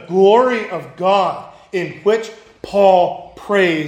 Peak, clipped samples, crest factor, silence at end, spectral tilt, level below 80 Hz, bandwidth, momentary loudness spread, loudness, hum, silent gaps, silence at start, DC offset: 0 dBFS; under 0.1%; 16 dB; 0 s; -6 dB/octave; -56 dBFS; 9.8 kHz; 17 LU; -16 LUFS; none; none; 0 s; under 0.1%